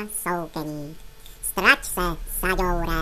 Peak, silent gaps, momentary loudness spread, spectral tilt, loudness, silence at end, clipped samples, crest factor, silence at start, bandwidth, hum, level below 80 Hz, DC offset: 0 dBFS; none; 15 LU; -3 dB/octave; -23 LUFS; 0 s; under 0.1%; 24 dB; 0 s; 14 kHz; none; -34 dBFS; under 0.1%